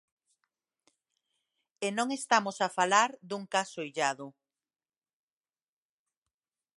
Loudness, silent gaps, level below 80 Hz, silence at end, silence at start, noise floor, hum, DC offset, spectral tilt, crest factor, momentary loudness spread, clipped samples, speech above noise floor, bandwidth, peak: -30 LUFS; none; -88 dBFS; 2.5 s; 1.8 s; under -90 dBFS; none; under 0.1%; -2.5 dB/octave; 26 dB; 12 LU; under 0.1%; over 60 dB; 11.5 kHz; -8 dBFS